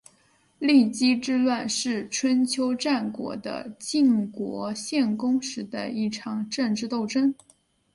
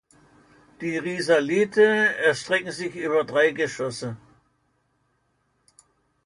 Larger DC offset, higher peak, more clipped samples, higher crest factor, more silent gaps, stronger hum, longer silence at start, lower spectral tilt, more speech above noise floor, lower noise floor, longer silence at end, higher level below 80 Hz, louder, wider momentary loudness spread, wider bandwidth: neither; about the same, -8 dBFS vs -6 dBFS; neither; about the same, 16 dB vs 18 dB; neither; neither; second, 0.6 s vs 0.8 s; about the same, -4 dB/octave vs -4.5 dB/octave; second, 38 dB vs 47 dB; second, -63 dBFS vs -70 dBFS; second, 0.6 s vs 2.1 s; about the same, -68 dBFS vs -68 dBFS; about the same, -25 LUFS vs -23 LUFS; second, 11 LU vs 14 LU; about the same, 11.5 kHz vs 11 kHz